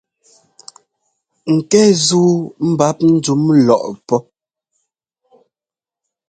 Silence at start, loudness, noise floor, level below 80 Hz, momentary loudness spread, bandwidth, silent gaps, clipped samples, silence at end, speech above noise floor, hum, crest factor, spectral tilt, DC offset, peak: 1.45 s; -14 LUFS; under -90 dBFS; -58 dBFS; 9 LU; 9.4 kHz; none; under 0.1%; 2.05 s; over 77 dB; none; 16 dB; -5.5 dB/octave; under 0.1%; 0 dBFS